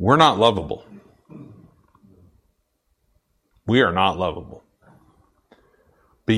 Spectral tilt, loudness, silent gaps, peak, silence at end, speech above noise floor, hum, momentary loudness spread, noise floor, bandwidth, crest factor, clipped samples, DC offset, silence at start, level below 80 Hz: -6 dB/octave; -19 LUFS; none; 0 dBFS; 0 s; 52 dB; none; 28 LU; -70 dBFS; 12 kHz; 22 dB; under 0.1%; under 0.1%; 0 s; -52 dBFS